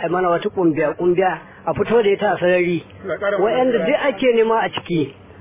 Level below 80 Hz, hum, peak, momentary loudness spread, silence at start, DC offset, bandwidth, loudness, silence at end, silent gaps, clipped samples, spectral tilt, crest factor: -52 dBFS; none; -4 dBFS; 7 LU; 0 s; under 0.1%; 3.8 kHz; -18 LUFS; 0 s; none; under 0.1%; -10 dB/octave; 14 dB